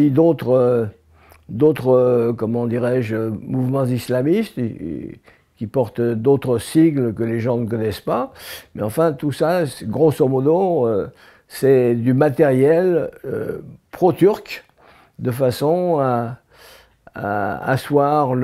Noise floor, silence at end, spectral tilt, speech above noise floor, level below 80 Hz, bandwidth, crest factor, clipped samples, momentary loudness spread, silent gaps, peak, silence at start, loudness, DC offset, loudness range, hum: -51 dBFS; 0 s; -7.5 dB/octave; 33 dB; -54 dBFS; 15.5 kHz; 14 dB; under 0.1%; 14 LU; none; -4 dBFS; 0 s; -18 LUFS; under 0.1%; 4 LU; none